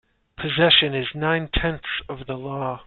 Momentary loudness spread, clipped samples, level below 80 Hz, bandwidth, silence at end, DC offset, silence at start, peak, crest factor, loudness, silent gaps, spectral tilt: 16 LU; under 0.1%; -38 dBFS; 4.4 kHz; 0.05 s; under 0.1%; 0.4 s; -2 dBFS; 20 dB; -21 LUFS; none; -9 dB/octave